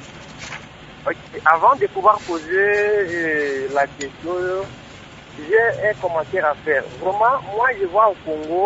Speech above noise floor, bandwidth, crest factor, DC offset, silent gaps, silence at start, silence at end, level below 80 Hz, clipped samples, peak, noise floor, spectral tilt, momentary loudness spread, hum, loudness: 21 dB; 8 kHz; 20 dB; under 0.1%; none; 0 s; 0 s; -52 dBFS; under 0.1%; 0 dBFS; -40 dBFS; -5 dB/octave; 18 LU; none; -19 LUFS